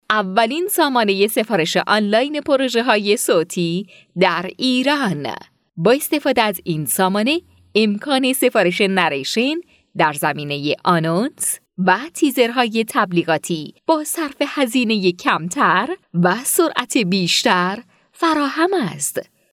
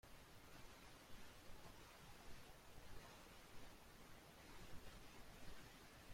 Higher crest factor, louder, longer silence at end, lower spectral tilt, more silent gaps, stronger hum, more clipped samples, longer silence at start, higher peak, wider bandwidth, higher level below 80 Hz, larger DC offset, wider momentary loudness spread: about the same, 18 dB vs 16 dB; first, -18 LUFS vs -63 LUFS; first, 0.3 s vs 0 s; about the same, -4 dB/octave vs -3.5 dB/octave; neither; neither; neither; about the same, 0.1 s vs 0.05 s; first, 0 dBFS vs -42 dBFS; about the same, 17.5 kHz vs 16.5 kHz; about the same, -64 dBFS vs -66 dBFS; neither; first, 7 LU vs 2 LU